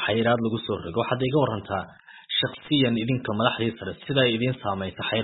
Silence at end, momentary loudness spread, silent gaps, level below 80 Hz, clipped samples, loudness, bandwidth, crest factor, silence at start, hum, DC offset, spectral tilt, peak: 0 s; 8 LU; none; -58 dBFS; under 0.1%; -25 LUFS; 4.1 kHz; 20 dB; 0 s; none; under 0.1%; -10.5 dB/octave; -4 dBFS